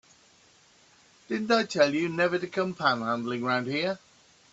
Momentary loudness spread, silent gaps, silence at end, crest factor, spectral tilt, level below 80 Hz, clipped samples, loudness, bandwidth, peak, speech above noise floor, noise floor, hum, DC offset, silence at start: 8 LU; none; 0.55 s; 20 dB; -5 dB/octave; -72 dBFS; under 0.1%; -27 LUFS; 8 kHz; -8 dBFS; 33 dB; -60 dBFS; none; under 0.1%; 1.3 s